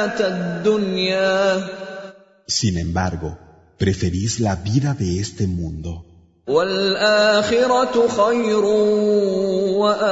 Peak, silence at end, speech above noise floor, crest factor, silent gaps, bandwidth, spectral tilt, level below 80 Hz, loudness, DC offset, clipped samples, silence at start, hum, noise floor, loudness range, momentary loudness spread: -4 dBFS; 0 s; 21 dB; 16 dB; none; 8 kHz; -5 dB/octave; -42 dBFS; -19 LUFS; under 0.1%; under 0.1%; 0 s; none; -40 dBFS; 6 LU; 13 LU